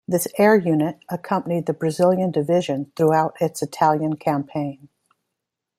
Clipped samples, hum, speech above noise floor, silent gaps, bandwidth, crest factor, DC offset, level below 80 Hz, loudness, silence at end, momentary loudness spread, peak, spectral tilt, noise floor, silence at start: under 0.1%; none; 62 dB; none; 16 kHz; 18 dB; under 0.1%; -64 dBFS; -21 LUFS; 1.05 s; 9 LU; -4 dBFS; -6.5 dB/octave; -82 dBFS; 0.1 s